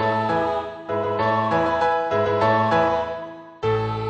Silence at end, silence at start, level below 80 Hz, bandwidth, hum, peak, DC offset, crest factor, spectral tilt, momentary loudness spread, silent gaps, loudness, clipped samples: 0 s; 0 s; -50 dBFS; 8.8 kHz; none; -8 dBFS; under 0.1%; 14 dB; -7 dB/octave; 9 LU; none; -21 LUFS; under 0.1%